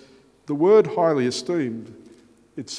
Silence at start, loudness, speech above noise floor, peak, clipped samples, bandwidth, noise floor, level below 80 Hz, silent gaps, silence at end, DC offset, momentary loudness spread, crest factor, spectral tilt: 0.5 s; -20 LUFS; 32 dB; -4 dBFS; under 0.1%; 10.5 kHz; -52 dBFS; -70 dBFS; none; 0 s; under 0.1%; 21 LU; 18 dB; -5.5 dB/octave